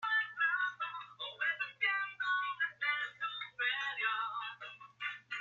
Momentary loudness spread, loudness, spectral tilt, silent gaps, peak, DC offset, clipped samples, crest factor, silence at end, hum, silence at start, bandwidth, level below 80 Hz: 10 LU; -36 LUFS; 0 dB/octave; none; -20 dBFS; under 0.1%; under 0.1%; 16 dB; 0 s; none; 0 s; 7.2 kHz; under -90 dBFS